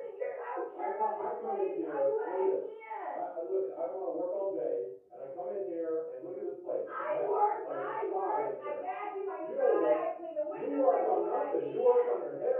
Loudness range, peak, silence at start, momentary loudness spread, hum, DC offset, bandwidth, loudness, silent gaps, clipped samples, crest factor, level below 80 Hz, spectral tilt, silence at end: 6 LU; -14 dBFS; 0 s; 11 LU; none; under 0.1%; 3.4 kHz; -33 LUFS; none; under 0.1%; 20 dB; under -90 dBFS; -5 dB/octave; 0 s